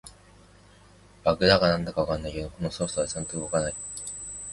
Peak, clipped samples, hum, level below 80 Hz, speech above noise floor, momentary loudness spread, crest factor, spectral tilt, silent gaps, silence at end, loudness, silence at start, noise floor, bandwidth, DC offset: -4 dBFS; under 0.1%; 50 Hz at -50 dBFS; -46 dBFS; 28 dB; 14 LU; 24 dB; -4 dB/octave; none; 0 s; -27 LUFS; 0.05 s; -54 dBFS; 11.5 kHz; under 0.1%